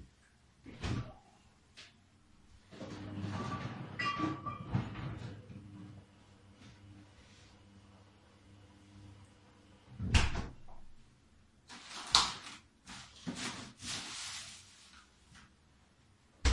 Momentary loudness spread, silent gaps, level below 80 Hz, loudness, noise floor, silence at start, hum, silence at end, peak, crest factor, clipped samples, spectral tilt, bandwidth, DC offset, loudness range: 27 LU; none; -48 dBFS; -38 LUFS; -67 dBFS; 0 s; none; 0 s; -6 dBFS; 36 dB; under 0.1%; -3.5 dB/octave; 11.5 kHz; under 0.1%; 22 LU